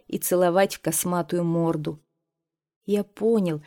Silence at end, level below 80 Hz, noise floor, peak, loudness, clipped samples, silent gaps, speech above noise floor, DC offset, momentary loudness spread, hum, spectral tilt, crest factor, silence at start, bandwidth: 0.05 s; -64 dBFS; -86 dBFS; -8 dBFS; -24 LUFS; under 0.1%; 2.76-2.81 s; 62 dB; under 0.1%; 11 LU; none; -5.5 dB/octave; 16 dB; 0.1 s; 18.5 kHz